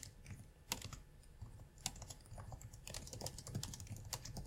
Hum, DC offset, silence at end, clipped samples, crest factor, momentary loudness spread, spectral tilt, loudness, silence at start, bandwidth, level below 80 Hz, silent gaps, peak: none; under 0.1%; 0 s; under 0.1%; 32 dB; 11 LU; -3 dB/octave; -50 LUFS; 0 s; 16.5 kHz; -58 dBFS; none; -20 dBFS